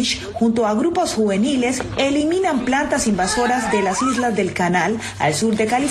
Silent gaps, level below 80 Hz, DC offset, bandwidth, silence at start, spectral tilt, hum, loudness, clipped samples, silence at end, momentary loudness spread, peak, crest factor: none; -44 dBFS; under 0.1%; 12.5 kHz; 0 s; -4 dB/octave; none; -19 LUFS; under 0.1%; 0 s; 2 LU; -4 dBFS; 14 dB